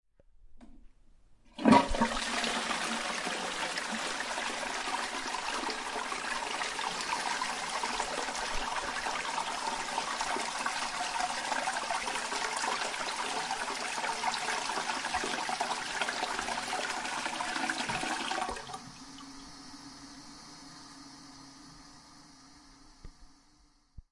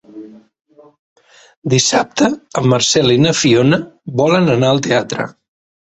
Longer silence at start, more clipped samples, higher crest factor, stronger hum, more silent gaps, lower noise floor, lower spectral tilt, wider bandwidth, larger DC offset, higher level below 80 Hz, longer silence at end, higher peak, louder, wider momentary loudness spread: first, 0.4 s vs 0.15 s; neither; first, 28 dB vs 14 dB; neither; second, none vs 0.99-1.16 s, 1.57-1.62 s; first, -64 dBFS vs -36 dBFS; second, -2 dB/octave vs -4.5 dB/octave; first, 11.5 kHz vs 8.2 kHz; neither; about the same, -54 dBFS vs -50 dBFS; second, 0.1 s vs 0.55 s; second, -8 dBFS vs 0 dBFS; second, -33 LUFS vs -14 LUFS; first, 17 LU vs 11 LU